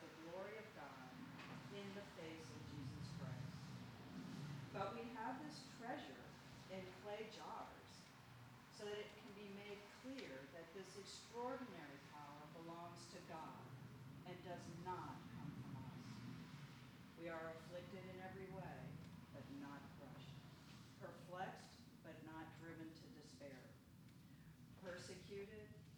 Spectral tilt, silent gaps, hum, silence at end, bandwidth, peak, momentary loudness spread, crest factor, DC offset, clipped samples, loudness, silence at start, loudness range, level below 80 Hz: -5.5 dB/octave; none; none; 0 s; over 20 kHz; -34 dBFS; 10 LU; 20 dB; under 0.1%; under 0.1%; -55 LUFS; 0 s; 5 LU; -78 dBFS